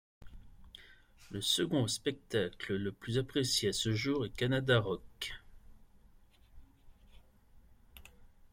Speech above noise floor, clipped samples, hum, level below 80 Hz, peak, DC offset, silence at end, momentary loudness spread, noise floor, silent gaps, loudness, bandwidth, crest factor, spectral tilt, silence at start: 28 dB; under 0.1%; none; -58 dBFS; -16 dBFS; under 0.1%; 0.25 s; 17 LU; -62 dBFS; none; -34 LUFS; 16.5 kHz; 22 dB; -4 dB/octave; 0.2 s